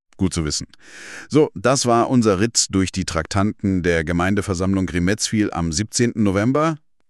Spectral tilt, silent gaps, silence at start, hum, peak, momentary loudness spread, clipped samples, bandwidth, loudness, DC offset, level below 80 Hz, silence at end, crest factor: -4.5 dB/octave; none; 0.2 s; none; -4 dBFS; 7 LU; under 0.1%; 13 kHz; -19 LUFS; under 0.1%; -40 dBFS; 0.35 s; 16 dB